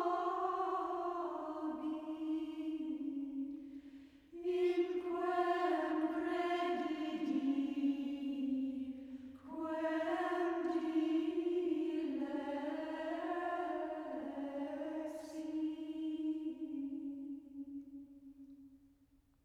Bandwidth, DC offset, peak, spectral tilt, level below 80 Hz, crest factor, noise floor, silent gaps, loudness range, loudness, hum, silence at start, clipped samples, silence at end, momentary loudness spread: 11 kHz; under 0.1%; -24 dBFS; -5 dB/octave; -76 dBFS; 16 dB; -71 dBFS; none; 6 LU; -39 LUFS; none; 0 s; under 0.1%; 0.7 s; 13 LU